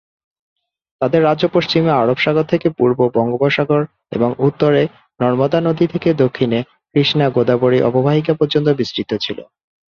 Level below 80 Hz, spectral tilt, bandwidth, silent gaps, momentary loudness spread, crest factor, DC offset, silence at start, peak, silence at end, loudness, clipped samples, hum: -54 dBFS; -7.5 dB/octave; 7 kHz; none; 7 LU; 14 dB; under 0.1%; 1 s; -2 dBFS; 0.45 s; -16 LUFS; under 0.1%; none